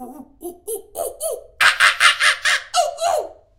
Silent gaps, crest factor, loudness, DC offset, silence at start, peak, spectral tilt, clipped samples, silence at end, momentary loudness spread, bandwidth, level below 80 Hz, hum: none; 20 dB; -16 LUFS; under 0.1%; 0 s; 0 dBFS; 1 dB/octave; under 0.1%; 0.25 s; 18 LU; 18 kHz; -56 dBFS; none